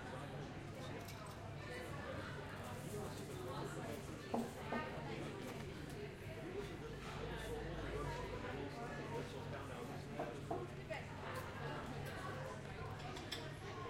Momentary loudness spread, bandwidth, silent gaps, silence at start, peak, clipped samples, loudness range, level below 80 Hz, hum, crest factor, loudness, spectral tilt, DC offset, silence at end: 4 LU; 16 kHz; none; 0 s; -26 dBFS; under 0.1%; 2 LU; -60 dBFS; none; 20 dB; -48 LUFS; -5.5 dB/octave; under 0.1%; 0 s